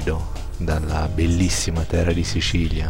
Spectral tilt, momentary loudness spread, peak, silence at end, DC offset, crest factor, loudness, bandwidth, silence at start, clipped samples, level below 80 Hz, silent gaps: -5 dB/octave; 8 LU; -6 dBFS; 0 s; 2%; 14 dB; -22 LUFS; 16.5 kHz; 0 s; under 0.1%; -26 dBFS; none